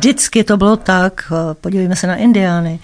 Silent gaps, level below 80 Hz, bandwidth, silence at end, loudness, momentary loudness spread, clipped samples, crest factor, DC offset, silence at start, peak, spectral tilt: none; -40 dBFS; 10.5 kHz; 0.05 s; -13 LUFS; 7 LU; under 0.1%; 12 dB; under 0.1%; 0 s; 0 dBFS; -5 dB/octave